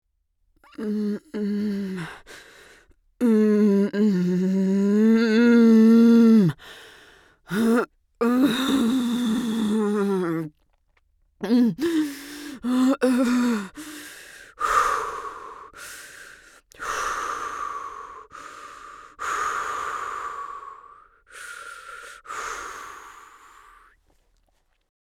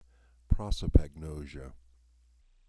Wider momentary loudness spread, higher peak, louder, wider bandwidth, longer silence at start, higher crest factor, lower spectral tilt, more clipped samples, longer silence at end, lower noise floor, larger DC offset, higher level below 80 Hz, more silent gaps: first, 23 LU vs 18 LU; about the same, -8 dBFS vs -6 dBFS; first, -22 LUFS vs -32 LUFS; first, 15.5 kHz vs 11 kHz; first, 0.8 s vs 0.5 s; second, 16 dB vs 26 dB; second, -6 dB/octave vs -7.5 dB/octave; neither; first, 1.9 s vs 0.9 s; first, -69 dBFS vs -63 dBFS; neither; second, -60 dBFS vs -34 dBFS; neither